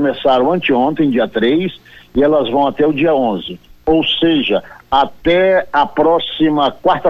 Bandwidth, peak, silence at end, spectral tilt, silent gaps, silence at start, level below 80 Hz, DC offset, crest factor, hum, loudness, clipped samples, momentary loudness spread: 6.6 kHz; -4 dBFS; 0 s; -7.5 dB/octave; none; 0 s; -42 dBFS; under 0.1%; 10 dB; none; -14 LUFS; under 0.1%; 5 LU